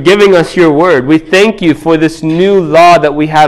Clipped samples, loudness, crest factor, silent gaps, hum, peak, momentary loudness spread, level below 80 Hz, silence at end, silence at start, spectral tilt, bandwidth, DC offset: 4%; -7 LUFS; 6 dB; none; none; 0 dBFS; 5 LU; -40 dBFS; 0 s; 0 s; -5.5 dB/octave; 13 kHz; under 0.1%